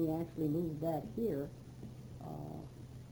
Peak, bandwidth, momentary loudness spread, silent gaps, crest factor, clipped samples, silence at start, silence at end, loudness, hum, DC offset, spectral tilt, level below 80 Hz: -26 dBFS; over 20 kHz; 15 LU; none; 14 dB; under 0.1%; 0 s; 0 s; -40 LUFS; none; under 0.1%; -9 dB/octave; -62 dBFS